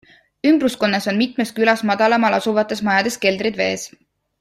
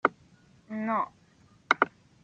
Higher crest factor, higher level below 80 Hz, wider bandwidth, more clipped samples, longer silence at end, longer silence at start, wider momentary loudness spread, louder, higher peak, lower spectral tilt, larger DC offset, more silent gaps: second, 16 dB vs 28 dB; first, -60 dBFS vs -74 dBFS; first, 15.5 kHz vs 8 kHz; neither; first, 0.55 s vs 0.35 s; first, 0.45 s vs 0.05 s; second, 5 LU vs 10 LU; first, -18 LUFS vs -30 LUFS; about the same, -2 dBFS vs -4 dBFS; about the same, -4.5 dB/octave vs -4.5 dB/octave; neither; neither